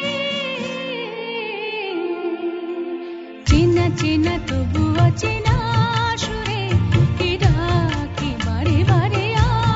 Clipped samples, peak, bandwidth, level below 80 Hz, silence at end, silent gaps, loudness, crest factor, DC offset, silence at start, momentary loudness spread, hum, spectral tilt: under 0.1%; -2 dBFS; 8 kHz; -30 dBFS; 0 s; none; -20 LUFS; 16 dB; under 0.1%; 0 s; 9 LU; none; -6 dB/octave